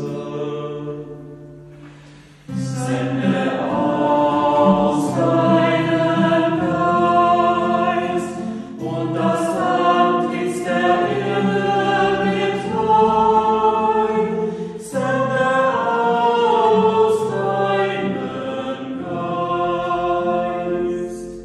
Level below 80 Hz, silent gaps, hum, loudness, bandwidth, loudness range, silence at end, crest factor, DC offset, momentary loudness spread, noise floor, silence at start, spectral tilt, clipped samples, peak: -52 dBFS; none; none; -18 LUFS; 12.5 kHz; 5 LU; 0 s; 16 dB; under 0.1%; 11 LU; -44 dBFS; 0 s; -6.5 dB/octave; under 0.1%; -2 dBFS